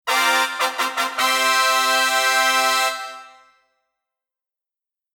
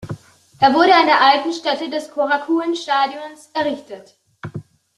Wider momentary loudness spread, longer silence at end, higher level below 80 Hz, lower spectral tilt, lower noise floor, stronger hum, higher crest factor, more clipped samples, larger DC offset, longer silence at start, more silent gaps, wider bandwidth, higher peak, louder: second, 6 LU vs 23 LU; first, 1.9 s vs 0.35 s; second, -74 dBFS vs -62 dBFS; second, 2.5 dB/octave vs -4.5 dB/octave; first, -88 dBFS vs -39 dBFS; neither; about the same, 18 dB vs 16 dB; neither; neither; about the same, 0.05 s vs 0 s; neither; first, over 20 kHz vs 12 kHz; about the same, -4 dBFS vs -2 dBFS; about the same, -17 LUFS vs -17 LUFS